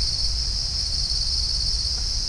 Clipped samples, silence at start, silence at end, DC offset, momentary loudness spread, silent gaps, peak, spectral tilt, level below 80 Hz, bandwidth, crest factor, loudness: under 0.1%; 0 s; 0 s; under 0.1%; 2 LU; none; -10 dBFS; -1.5 dB/octave; -28 dBFS; 10.5 kHz; 14 dB; -22 LUFS